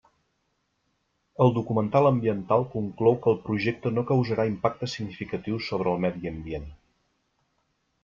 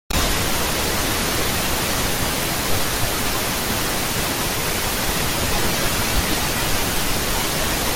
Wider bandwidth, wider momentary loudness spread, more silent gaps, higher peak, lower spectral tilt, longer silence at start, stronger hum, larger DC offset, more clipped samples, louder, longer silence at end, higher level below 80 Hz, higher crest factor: second, 7.4 kHz vs 17 kHz; first, 12 LU vs 1 LU; neither; about the same, -6 dBFS vs -6 dBFS; first, -8 dB/octave vs -2.5 dB/octave; first, 1.4 s vs 0.1 s; neither; neither; neither; second, -26 LUFS vs -20 LUFS; first, 1.3 s vs 0 s; second, -54 dBFS vs -30 dBFS; first, 20 dB vs 14 dB